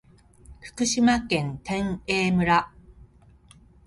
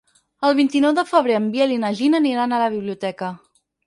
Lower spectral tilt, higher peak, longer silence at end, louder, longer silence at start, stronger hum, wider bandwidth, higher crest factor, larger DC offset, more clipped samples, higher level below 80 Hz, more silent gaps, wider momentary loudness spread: about the same, -4.5 dB/octave vs -5.5 dB/octave; second, -8 dBFS vs -2 dBFS; first, 0.85 s vs 0.5 s; second, -24 LUFS vs -19 LUFS; about the same, 0.5 s vs 0.4 s; neither; about the same, 11.5 kHz vs 11.5 kHz; about the same, 18 dB vs 18 dB; neither; neither; first, -48 dBFS vs -68 dBFS; neither; first, 17 LU vs 10 LU